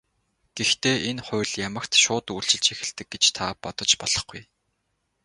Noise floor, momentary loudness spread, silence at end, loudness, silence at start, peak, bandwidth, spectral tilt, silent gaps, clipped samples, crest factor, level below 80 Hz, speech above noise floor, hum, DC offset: -75 dBFS; 11 LU; 0.8 s; -22 LUFS; 0.55 s; -4 dBFS; 11.5 kHz; -1.5 dB/octave; none; under 0.1%; 22 dB; -56 dBFS; 50 dB; none; under 0.1%